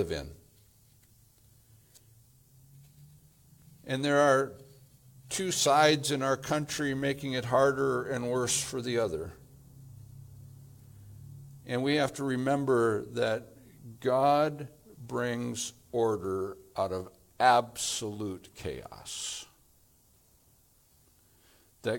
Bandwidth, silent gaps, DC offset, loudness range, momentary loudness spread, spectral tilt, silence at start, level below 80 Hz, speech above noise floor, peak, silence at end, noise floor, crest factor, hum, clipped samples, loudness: 18.5 kHz; none; under 0.1%; 11 LU; 24 LU; -4 dB/octave; 0 s; -62 dBFS; 35 dB; -8 dBFS; 0 s; -64 dBFS; 22 dB; none; under 0.1%; -30 LUFS